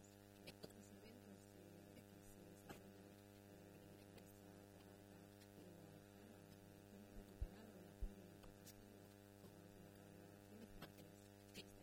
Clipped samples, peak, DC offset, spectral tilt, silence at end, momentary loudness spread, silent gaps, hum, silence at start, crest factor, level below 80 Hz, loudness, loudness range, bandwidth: under 0.1%; -36 dBFS; under 0.1%; -5 dB/octave; 0 s; 6 LU; none; 50 Hz at -70 dBFS; 0 s; 24 dB; -64 dBFS; -62 LUFS; 3 LU; 16 kHz